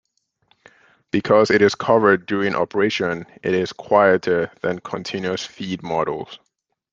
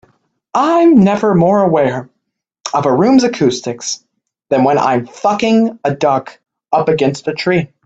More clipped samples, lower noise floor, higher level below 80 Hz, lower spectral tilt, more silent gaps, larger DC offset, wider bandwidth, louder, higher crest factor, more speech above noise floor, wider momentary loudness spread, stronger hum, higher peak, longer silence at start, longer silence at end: neither; second, -64 dBFS vs -73 dBFS; second, -60 dBFS vs -54 dBFS; about the same, -5.5 dB/octave vs -6 dB/octave; neither; neither; about the same, 7.6 kHz vs 8.2 kHz; second, -20 LUFS vs -13 LUFS; about the same, 18 dB vs 14 dB; second, 45 dB vs 60 dB; about the same, 12 LU vs 10 LU; neither; about the same, -2 dBFS vs 0 dBFS; first, 1.15 s vs 0.55 s; first, 0.55 s vs 0.2 s